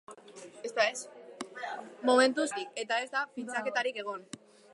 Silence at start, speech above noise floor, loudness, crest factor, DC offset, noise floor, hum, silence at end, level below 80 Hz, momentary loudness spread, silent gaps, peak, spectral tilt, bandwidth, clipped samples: 0.1 s; 20 dB; -31 LUFS; 22 dB; under 0.1%; -51 dBFS; none; 0.4 s; -90 dBFS; 23 LU; none; -12 dBFS; -2 dB/octave; 11.5 kHz; under 0.1%